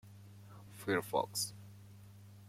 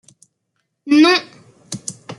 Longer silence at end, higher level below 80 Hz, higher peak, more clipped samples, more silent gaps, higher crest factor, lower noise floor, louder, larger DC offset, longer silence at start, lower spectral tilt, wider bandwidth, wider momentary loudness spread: about the same, 0 s vs 0.05 s; second, -76 dBFS vs -70 dBFS; second, -20 dBFS vs -2 dBFS; neither; neither; about the same, 22 dB vs 18 dB; second, -56 dBFS vs -72 dBFS; second, -37 LUFS vs -14 LUFS; neither; second, 0.05 s vs 0.85 s; about the same, -3.5 dB/octave vs -3.5 dB/octave; first, 16.5 kHz vs 11.5 kHz; first, 22 LU vs 17 LU